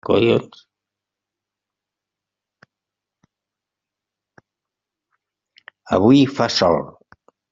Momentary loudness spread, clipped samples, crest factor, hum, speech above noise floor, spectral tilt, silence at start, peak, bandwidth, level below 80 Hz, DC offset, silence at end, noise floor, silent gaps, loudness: 9 LU; under 0.1%; 22 dB; 50 Hz at -70 dBFS; 70 dB; -5 dB/octave; 0.1 s; 0 dBFS; 7.6 kHz; -58 dBFS; under 0.1%; 0.6 s; -86 dBFS; none; -17 LUFS